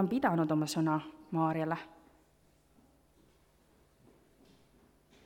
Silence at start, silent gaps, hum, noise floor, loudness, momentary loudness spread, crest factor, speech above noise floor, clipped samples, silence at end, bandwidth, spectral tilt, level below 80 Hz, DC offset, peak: 0 s; none; none; -68 dBFS; -33 LUFS; 9 LU; 20 dB; 36 dB; under 0.1%; 3.35 s; 17 kHz; -6.5 dB/octave; -72 dBFS; under 0.1%; -16 dBFS